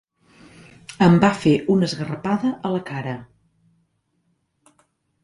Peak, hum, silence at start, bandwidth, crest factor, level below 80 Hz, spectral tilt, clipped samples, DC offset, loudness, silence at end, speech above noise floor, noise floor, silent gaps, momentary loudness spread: -4 dBFS; none; 0.9 s; 11 kHz; 20 dB; -56 dBFS; -7 dB/octave; under 0.1%; under 0.1%; -20 LUFS; 2 s; 50 dB; -69 dBFS; none; 18 LU